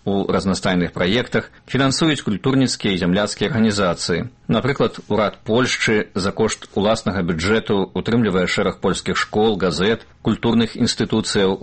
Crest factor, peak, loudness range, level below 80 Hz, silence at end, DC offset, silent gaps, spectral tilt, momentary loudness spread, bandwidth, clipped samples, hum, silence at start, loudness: 16 dB; -4 dBFS; 1 LU; -44 dBFS; 0 s; under 0.1%; none; -5 dB/octave; 4 LU; 8.8 kHz; under 0.1%; none; 0.05 s; -19 LUFS